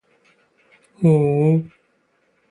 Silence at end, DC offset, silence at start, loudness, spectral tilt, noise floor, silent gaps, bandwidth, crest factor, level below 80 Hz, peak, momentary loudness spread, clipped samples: 0.85 s; under 0.1%; 1 s; -18 LUFS; -10.5 dB/octave; -64 dBFS; none; 10 kHz; 16 dB; -58 dBFS; -4 dBFS; 8 LU; under 0.1%